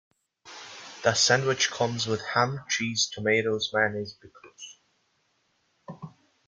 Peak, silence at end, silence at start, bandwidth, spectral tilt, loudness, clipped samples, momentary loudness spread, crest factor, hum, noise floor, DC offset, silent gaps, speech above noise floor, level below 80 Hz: -8 dBFS; 0.4 s; 0.45 s; 10 kHz; -2.5 dB/octave; -25 LUFS; under 0.1%; 23 LU; 22 dB; none; -71 dBFS; under 0.1%; none; 45 dB; -68 dBFS